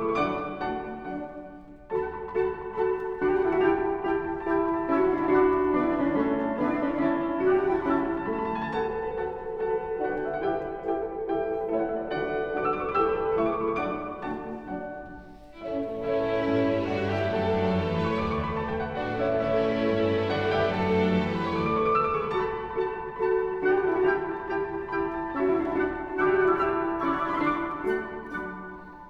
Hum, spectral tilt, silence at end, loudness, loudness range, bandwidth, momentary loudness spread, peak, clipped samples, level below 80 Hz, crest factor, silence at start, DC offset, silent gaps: none; -8 dB/octave; 0 s; -27 LUFS; 5 LU; 6.6 kHz; 10 LU; -10 dBFS; under 0.1%; -50 dBFS; 16 dB; 0 s; under 0.1%; none